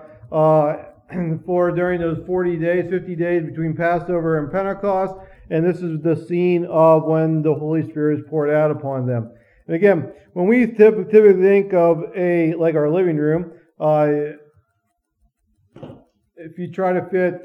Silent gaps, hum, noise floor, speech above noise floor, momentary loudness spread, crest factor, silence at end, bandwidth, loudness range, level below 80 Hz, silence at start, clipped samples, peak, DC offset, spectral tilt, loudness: none; none; -71 dBFS; 54 dB; 11 LU; 18 dB; 0.05 s; 5.6 kHz; 7 LU; -54 dBFS; 0 s; under 0.1%; 0 dBFS; under 0.1%; -10 dB/octave; -18 LUFS